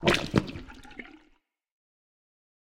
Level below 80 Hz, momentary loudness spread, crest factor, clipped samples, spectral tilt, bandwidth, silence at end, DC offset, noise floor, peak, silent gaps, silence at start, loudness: -50 dBFS; 20 LU; 26 dB; under 0.1%; -5 dB/octave; 16.5 kHz; 1.45 s; under 0.1%; -67 dBFS; -6 dBFS; none; 0 s; -28 LUFS